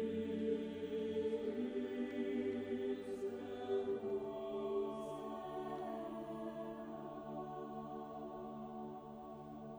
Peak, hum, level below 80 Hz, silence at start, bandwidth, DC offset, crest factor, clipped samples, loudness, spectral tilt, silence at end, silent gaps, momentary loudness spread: -28 dBFS; none; -72 dBFS; 0 s; over 20 kHz; under 0.1%; 14 dB; under 0.1%; -44 LUFS; -7 dB/octave; 0 s; none; 9 LU